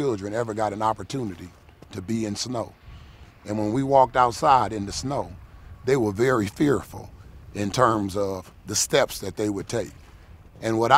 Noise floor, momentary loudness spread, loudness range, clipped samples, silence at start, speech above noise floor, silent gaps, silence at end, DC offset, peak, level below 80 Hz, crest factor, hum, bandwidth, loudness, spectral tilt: -47 dBFS; 18 LU; 7 LU; under 0.1%; 0 s; 24 dB; none; 0 s; under 0.1%; -2 dBFS; -50 dBFS; 24 dB; none; 16 kHz; -24 LUFS; -4.5 dB/octave